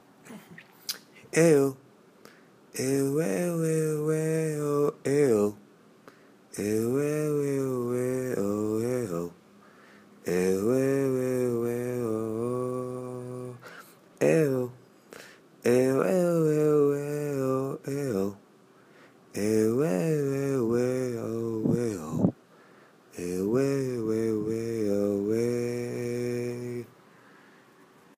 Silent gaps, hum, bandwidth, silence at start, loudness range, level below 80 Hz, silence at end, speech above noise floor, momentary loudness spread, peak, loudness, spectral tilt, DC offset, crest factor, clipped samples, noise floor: none; none; 15.5 kHz; 0.25 s; 4 LU; -68 dBFS; 1.3 s; 33 dB; 15 LU; -10 dBFS; -28 LUFS; -6.5 dB/octave; under 0.1%; 20 dB; under 0.1%; -57 dBFS